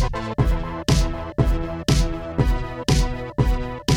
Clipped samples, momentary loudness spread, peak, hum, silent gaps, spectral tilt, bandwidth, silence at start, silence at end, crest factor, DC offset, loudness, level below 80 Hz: under 0.1%; 4 LU; -6 dBFS; none; none; -5.5 dB/octave; 15 kHz; 0 s; 0 s; 16 dB; under 0.1%; -23 LUFS; -24 dBFS